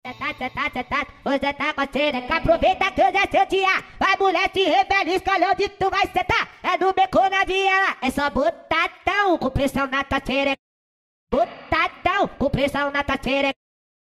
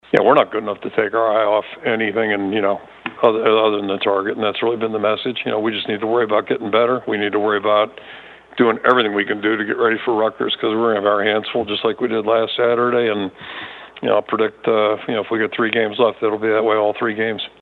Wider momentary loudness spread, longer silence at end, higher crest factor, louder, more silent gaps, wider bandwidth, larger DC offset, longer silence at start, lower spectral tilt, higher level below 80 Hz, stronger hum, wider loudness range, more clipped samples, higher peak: about the same, 7 LU vs 7 LU; first, 0.65 s vs 0.15 s; about the same, 16 dB vs 18 dB; second, -21 LUFS vs -18 LUFS; first, 10.59-11.27 s vs none; first, 14.5 kHz vs 4.5 kHz; neither; about the same, 0.05 s vs 0.15 s; second, -4.5 dB/octave vs -7 dB/octave; first, -42 dBFS vs -64 dBFS; neither; first, 4 LU vs 1 LU; neither; second, -4 dBFS vs 0 dBFS